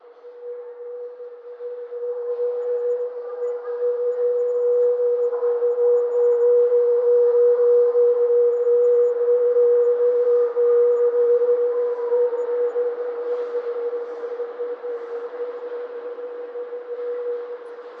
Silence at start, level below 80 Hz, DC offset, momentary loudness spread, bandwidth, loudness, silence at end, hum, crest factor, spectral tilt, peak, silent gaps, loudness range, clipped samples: 0.05 s; -84 dBFS; under 0.1%; 16 LU; 2.5 kHz; -20 LUFS; 0 s; none; 10 dB; -5 dB/octave; -10 dBFS; none; 12 LU; under 0.1%